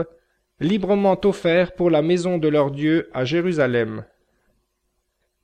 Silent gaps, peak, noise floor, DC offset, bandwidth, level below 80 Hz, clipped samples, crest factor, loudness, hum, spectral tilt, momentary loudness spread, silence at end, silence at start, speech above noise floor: none; -6 dBFS; -72 dBFS; under 0.1%; 9.6 kHz; -54 dBFS; under 0.1%; 14 dB; -20 LUFS; none; -7 dB/octave; 6 LU; 1.4 s; 0 s; 53 dB